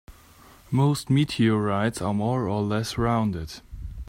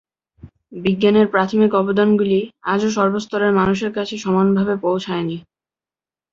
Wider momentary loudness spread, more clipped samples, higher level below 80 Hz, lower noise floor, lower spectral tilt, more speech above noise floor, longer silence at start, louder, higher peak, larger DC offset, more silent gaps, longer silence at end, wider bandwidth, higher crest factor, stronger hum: first, 12 LU vs 9 LU; neither; first, -44 dBFS vs -54 dBFS; second, -51 dBFS vs under -90 dBFS; about the same, -6.5 dB/octave vs -6.5 dB/octave; second, 28 dB vs over 73 dB; second, 0.1 s vs 0.45 s; second, -24 LUFS vs -18 LUFS; second, -10 dBFS vs -2 dBFS; neither; neither; second, 0 s vs 0.95 s; first, 16 kHz vs 7.6 kHz; about the same, 14 dB vs 16 dB; neither